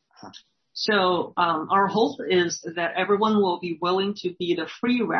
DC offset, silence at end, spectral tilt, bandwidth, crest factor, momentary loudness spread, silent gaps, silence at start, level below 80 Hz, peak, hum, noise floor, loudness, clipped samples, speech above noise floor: under 0.1%; 0 s; -4.5 dB/octave; 6.4 kHz; 18 dB; 6 LU; none; 0.25 s; -70 dBFS; -6 dBFS; none; -49 dBFS; -23 LUFS; under 0.1%; 26 dB